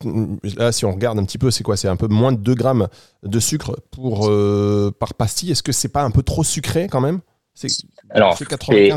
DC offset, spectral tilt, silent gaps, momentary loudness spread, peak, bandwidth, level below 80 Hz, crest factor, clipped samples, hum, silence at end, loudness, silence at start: 0.4%; -5 dB/octave; none; 8 LU; 0 dBFS; 16.5 kHz; -40 dBFS; 18 dB; under 0.1%; none; 0 s; -19 LUFS; 0 s